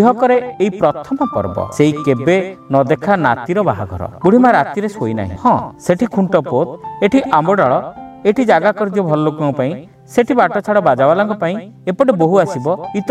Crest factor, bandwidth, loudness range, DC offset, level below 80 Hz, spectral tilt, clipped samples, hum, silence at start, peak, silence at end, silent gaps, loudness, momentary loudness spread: 14 dB; 13 kHz; 1 LU; under 0.1%; -50 dBFS; -7 dB/octave; under 0.1%; none; 0 s; 0 dBFS; 0 s; none; -15 LUFS; 8 LU